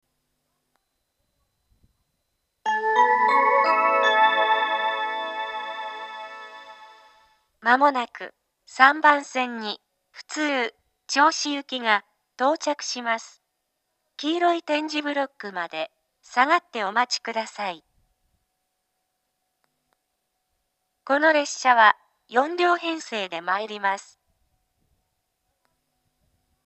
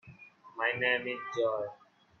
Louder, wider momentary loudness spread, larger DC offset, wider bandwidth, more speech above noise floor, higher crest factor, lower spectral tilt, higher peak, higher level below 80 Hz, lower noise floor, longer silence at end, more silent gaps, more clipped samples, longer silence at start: first, -22 LUFS vs -32 LUFS; first, 15 LU vs 12 LU; neither; first, 8.8 kHz vs 6.8 kHz; first, 54 dB vs 22 dB; first, 26 dB vs 20 dB; second, -1.5 dB/octave vs -4.5 dB/octave; first, 0 dBFS vs -14 dBFS; about the same, -78 dBFS vs -78 dBFS; first, -77 dBFS vs -54 dBFS; first, 2.65 s vs 0.45 s; neither; neither; first, 2.65 s vs 0.05 s